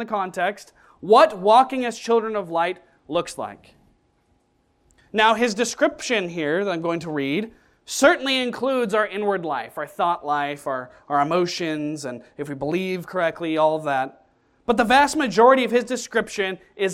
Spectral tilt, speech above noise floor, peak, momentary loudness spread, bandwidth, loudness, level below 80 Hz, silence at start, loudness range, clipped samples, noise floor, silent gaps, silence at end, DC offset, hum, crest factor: -4 dB/octave; 44 dB; -4 dBFS; 14 LU; 16 kHz; -21 LUFS; -60 dBFS; 0 s; 5 LU; under 0.1%; -65 dBFS; none; 0 s; under 0.1%; none; 18 dB